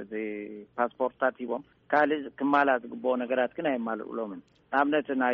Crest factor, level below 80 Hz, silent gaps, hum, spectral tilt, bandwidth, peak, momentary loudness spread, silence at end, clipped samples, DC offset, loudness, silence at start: 18 dB; -72 dBFS; none; none; -3 dB/octave; 6 kHz; -10 dBFS; 12 LU; 0 s; under 0.1%; under 0.1%; -29 LUFS; 0 s